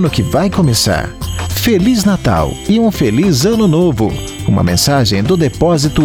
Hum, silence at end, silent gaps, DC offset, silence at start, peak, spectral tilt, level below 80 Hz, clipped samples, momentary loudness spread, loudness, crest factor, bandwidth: none; 0 s; none; under 0.1%; 0 s; -2 dBFS; -5.5 dB/octave; -28 dBFS; under 0.1%; 6 LU; -12 LUFS; 10 dB; 19.5 kHz